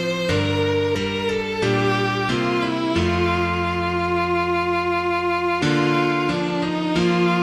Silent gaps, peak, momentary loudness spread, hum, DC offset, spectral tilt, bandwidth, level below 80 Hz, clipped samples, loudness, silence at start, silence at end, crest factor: none; -8 dBFS; 3 LU; none; under 0.1%; -6 dB/octave; 12.5 kHz; -44 dBFS; under 0.1%; -21 LUFS; 0 s; 0 s; 12 dB